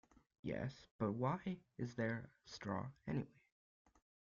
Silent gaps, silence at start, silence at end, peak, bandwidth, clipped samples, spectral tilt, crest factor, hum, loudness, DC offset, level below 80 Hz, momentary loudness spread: 0.91-0.99 s; 0.45 s; 1.1 s; -26 dBFS; 7.4 kHz; under 0.1%; -6.5 dB/octave; 20 dB; none; -45 LUFS; under 0.1%; -72 dBFS; 10 LU